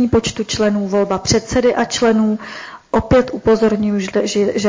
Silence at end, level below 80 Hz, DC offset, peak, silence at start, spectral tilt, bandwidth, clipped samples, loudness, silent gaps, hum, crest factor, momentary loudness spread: 0 s; -36 dBFS; under 0.1%; -4 dBFS; 0 s; -5 dB/octave; 7.6 kHz; under 0.1%; -16 LUFS; none; none; 12 dB; 6 LU